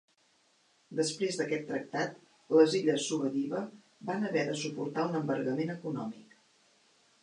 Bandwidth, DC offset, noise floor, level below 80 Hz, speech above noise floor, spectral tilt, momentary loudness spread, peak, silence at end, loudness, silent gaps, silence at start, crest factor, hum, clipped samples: 11 kHz; under 0.1%; -69 dBFS; -84 dBFS; 38 dB; -5 dB/octave; 13 LU; -12 dBFS; 1 s; -32 LUFS; none; 0.9 s; 22 dB; none; under 0.1%